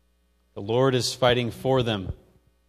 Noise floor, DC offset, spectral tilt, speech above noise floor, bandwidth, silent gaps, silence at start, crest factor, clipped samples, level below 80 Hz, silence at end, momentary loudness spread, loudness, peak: -66 dBFS; under 0.1%; -5 dB/octave; 43 dB; 15 kHz; none; 0.55 s; 20 dB; under 0.1%; -48 dBFS; 0.55 s; 17 LU; -24 LUFS; -4 dBFS